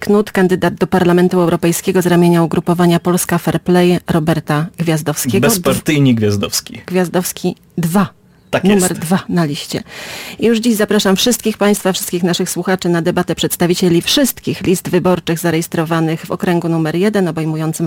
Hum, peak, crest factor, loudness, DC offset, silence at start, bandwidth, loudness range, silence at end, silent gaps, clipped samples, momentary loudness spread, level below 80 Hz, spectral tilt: none; -2 dBFS; 12 dB; -14 LUFS; under 0.1%; 0 s; 17 kHz; 3 LU; 0 s; none; under 0.1%; 7 LU; -44 dBFS; -5 dB/octave